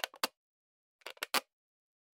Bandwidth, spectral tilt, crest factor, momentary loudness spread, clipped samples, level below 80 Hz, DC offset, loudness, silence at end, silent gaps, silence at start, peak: 17 kHz; 1 dB/octave; 30 dB; 16 LU; under 0.1%; -88 dBFS; under 0.1%; -37 LUFS; 0.7 s; 0.37-0.99 s; 0.05 s; -12 dBFS